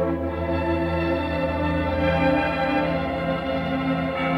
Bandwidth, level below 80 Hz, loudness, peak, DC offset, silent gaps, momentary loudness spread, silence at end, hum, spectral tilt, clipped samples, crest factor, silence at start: 10.5 kHz; -38 dBFS; -24 LUFS; -10 dBFS; under 0.1%; none; 4 LU; 0 s; none; -8 dB/octave; under 0.1%; 12 dB; 0 s